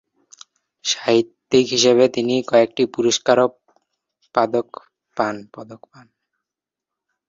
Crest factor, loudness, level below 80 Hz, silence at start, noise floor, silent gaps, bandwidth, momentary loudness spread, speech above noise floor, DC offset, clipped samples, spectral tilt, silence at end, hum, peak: 20 dB; -18 LUFS; -64 dBFS; 0.85 s; -86 dBFS; none; 7.8 kHz; 16 LU; 68 dB; under 0.1%; under 0.1%; -3.5 dB/octave; 1.5 s; none; -2 dBFS